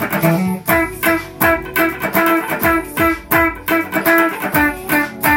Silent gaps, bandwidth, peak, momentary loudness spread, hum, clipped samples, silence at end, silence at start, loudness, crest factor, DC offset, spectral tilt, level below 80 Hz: none; 17 kHz; 0 dBFS; 3 LU; none; under 0.1%; 0 s; 0 s; -15 LUFS; 16 dB; under 0.1%; -5 dB/octave; -38 dBFS